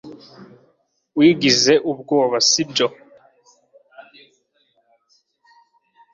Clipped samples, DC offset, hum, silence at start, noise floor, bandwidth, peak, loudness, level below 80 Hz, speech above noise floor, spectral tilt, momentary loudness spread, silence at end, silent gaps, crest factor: under 0.1%; under 0.1%; none; 0.05 s; -64 dBFS; 7.8 kHz; -2 dBFS; -16 LUFS; -64 dBFS; 48 dB; -3 dB/octave; 8 LU; 2.15 s; none; 20 dB